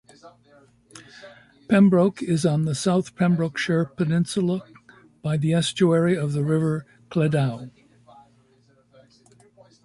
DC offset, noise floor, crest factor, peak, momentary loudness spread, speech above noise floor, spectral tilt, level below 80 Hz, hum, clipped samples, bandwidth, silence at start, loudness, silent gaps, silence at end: under 0.1%; -60 dBFS; 18 dB; -6 dBFS; 11 LU; 38 dB; -6.5 dB/octave; -62 dBFS; none; under 0.1%; 11.5 kHz; 0.25 s; -22 LUFS; none; 2.15 s